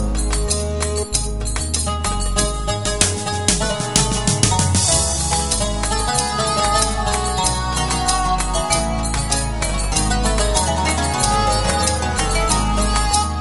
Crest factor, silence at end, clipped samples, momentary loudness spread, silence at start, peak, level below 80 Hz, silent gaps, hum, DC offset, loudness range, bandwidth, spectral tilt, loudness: 18 dB; 0 s; under 0.1%; 5 LU; 0 s; 0 dBFS; -24 dBFS; none; none; 0.8%; 2 LU; 11.5 kHz; -3 dB/octave; -18 LUFS